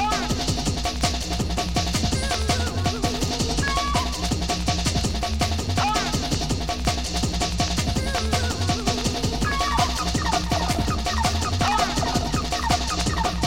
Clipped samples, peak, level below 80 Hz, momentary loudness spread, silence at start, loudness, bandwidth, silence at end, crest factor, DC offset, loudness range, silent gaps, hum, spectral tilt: under 0.1%; -6 dBFS; -30 dBFS; 3 LU; 0 s; -23 LUFS; 16.5 kHz; 0 s; 16 dB; 0.8%; 1 LU; none; none; -4 dB/octave